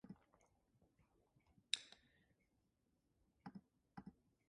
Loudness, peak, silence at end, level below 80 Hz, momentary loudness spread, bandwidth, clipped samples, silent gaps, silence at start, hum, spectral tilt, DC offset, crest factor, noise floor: -50 LUFS; -18 dBFS; 0.35 s; -84 dBFS; 19 LU; 9.6 kHz; under 0.1%; none; 0.05 s; none; -1.5 dB/octave; under 0.1%; 40 dB; -85 dBFS